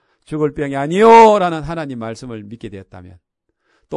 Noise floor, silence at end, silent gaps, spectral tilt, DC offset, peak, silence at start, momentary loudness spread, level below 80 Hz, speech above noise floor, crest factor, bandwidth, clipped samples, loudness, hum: -64 dBFS; 0 s; none; -6 dB/octave; under 0.1%; 0 dBFS; 0.3 s; 24 LU; -48 dBFS; 50 dB; 16 dB; 11 kHz; 0.4%; -12 LUFS; none